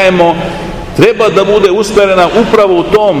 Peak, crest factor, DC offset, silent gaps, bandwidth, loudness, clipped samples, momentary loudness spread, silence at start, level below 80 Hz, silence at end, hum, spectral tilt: 0 dBFS; 8 dB; under 0.1%; none; 15 kHz; -8 LUFS; 5%; 9 LU; 0 s; -30 dBFS; 0 s; none; -5.5 dB/octave